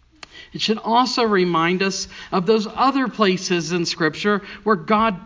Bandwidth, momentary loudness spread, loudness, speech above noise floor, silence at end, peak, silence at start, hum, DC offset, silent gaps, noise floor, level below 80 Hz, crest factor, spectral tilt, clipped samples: 7.6 kHz; 6 LU; -20 LUFS; 24 dB; 0 s; -2 dBFS; 0.35 s; none; under 0.1%; none; -43 dBFS; -54 dBFS; 18 dB; -4.5 dB/octave; under 0.1%